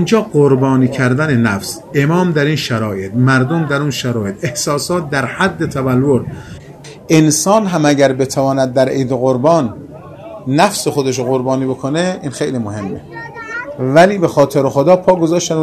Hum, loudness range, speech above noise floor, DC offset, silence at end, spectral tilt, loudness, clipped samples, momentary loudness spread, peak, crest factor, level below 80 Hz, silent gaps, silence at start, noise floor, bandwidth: none; 4 LU; 21 dB; under 0.1%; 0 s; -5.5 dB/octave; -14 LUFS; under 0.1%; 14 LU; 0 dBFS; 14 dB; -48 dBFS; none; 0 s; -34 dBFS; 14 kHz